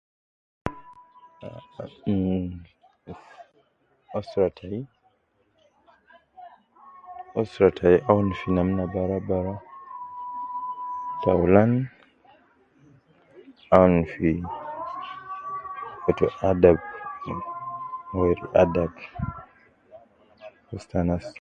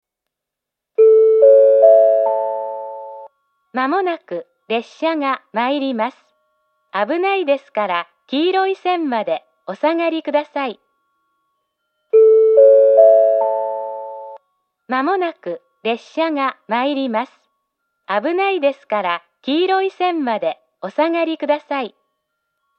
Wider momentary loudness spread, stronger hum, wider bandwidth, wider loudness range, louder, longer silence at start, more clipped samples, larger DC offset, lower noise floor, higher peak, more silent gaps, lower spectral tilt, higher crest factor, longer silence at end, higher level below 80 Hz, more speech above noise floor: first, 22 LU vs 17 LU; neither; first, 7.8 kHz vs 6 kHz; about the same, 10 LU vs 8 LU; second, -25 LUFS vs -16 LUFS; second, 0.65 s vs 1 s; neither; neither; second, -68 dBFS vs -83 dBFS; about the same, 0 dBFS vs 0 dBFS; neither; first, -9 dB/octave vs -6 dB/octave; first, 26 dB vs 16 dB; second, 0.1 s vs 0.9 s; first, -46 dBFS vs -88 dBFS; second, 45 dB vs 64 dB